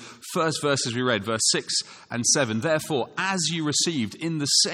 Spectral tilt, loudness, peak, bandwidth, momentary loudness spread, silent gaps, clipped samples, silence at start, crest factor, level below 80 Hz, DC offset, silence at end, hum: -2.5 dB/octave; -24 LUFS; -8 dBFS; 17 kHz; 7 LU; none; under 0.1%; 0 s; 18 dB; -68 dBFS; under 0.1%; 0 s; none